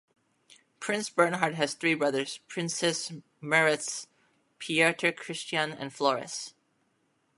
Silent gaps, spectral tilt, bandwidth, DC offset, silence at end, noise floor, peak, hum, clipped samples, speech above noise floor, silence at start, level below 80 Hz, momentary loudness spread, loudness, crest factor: none; -3 dB/octave; 11.5 kHz; under 0.1%; 0.85 s; -73 dBFS; -8 dBFS; none; under 0.1%; 44 dB; 0.8 s; -78 dBFS; 14 LU; -28 LUFS; 24 dB